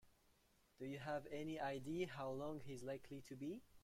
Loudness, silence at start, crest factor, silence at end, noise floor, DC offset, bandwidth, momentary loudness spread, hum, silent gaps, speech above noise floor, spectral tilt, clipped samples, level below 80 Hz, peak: -49 LUFS; 0.05 s; 16 dB; 0.05 s; -76 dBFS; under 0.1%; 16.5 kHz; 7 LU; none; none; 28 dB; -6 dB/octave; under 0.1%; -74 dBFS; -32 dBFS